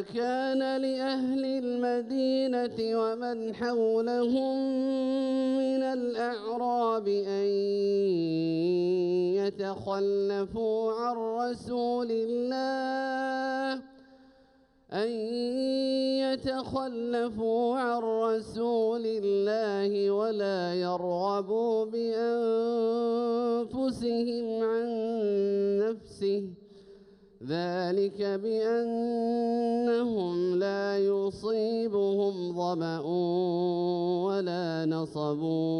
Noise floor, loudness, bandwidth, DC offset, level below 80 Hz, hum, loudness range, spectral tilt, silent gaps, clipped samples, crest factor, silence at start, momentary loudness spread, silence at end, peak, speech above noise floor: -62 dBFS; -29 LUFS; 11 kHz; under 0.1%; -66 dBFS; none; 3 LU; -7 dB/octave; none; under 0.1%; 10 dB; 0 s; 4 LU; 0 s; -18 dBFS; 34 dB